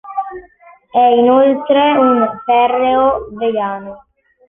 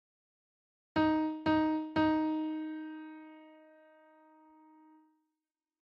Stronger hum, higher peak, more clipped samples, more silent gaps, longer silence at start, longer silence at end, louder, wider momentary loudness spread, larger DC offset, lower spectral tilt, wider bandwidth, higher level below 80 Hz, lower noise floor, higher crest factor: neither; first, -2 dBFS vs -20 dBFS; neither; neither; second, 0.05 s vs 0.95 s; second, 0.5 s vs 2.45 s; first, -13 LUFS vs -32 LUFS; second, 14 LU vs 18 LU; neither; about the same, -8 dB/octave vs -7.5 dB/octave; second, 3.8 kHz vs 5.6 kHz; first, -50 dBFS vs -66 dBFS; second, -45 dBFS vs under -90 dBFS; about the same, 12 dB vs 16 dB